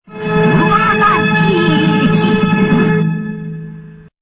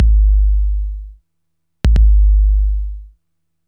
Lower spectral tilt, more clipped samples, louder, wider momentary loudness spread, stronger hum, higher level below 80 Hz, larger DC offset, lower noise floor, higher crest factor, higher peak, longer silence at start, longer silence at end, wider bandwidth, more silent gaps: first, -11 dB/octave vs -8 dB/octave; neither; first, -12 LUFS vs -16 LUFS; about the same, 14 LU vs 16 LU; neither; second, -42 dBFS vs -14 dBFS; neither; second, -32 dBFS vs -75 dBFS; about the same, 12 dB vs 12 dB; about the same, 0 dBFS vs 0 dBFS; about the same, 0.1 s vs 0 s; second, 0.25 s vs 0.6 s; first, 4 kHz vs 3.3 kHz; neither